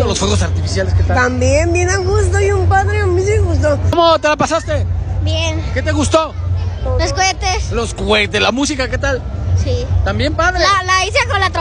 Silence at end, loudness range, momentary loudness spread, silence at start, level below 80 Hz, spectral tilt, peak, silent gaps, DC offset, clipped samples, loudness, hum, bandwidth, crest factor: 0 s; 3 LU; 6 LU; 0 s; -24 dBFS; -4.5 dB/octave; 0 dBFS; none; under 0.1%; under 0.1%; -14 LUFS; none; 10.5 kHz; 14 dB